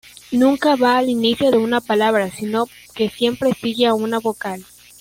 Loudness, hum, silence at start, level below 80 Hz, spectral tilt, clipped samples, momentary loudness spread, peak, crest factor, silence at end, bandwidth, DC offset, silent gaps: -18 LUFS; none; 0.3 s; -56 dBFS; -4.5 dB/octave; under 0.1%; 8 LU; -4 dBFS; 14 dB; 0.4 s; 16.5 kHz; under 0.1%; none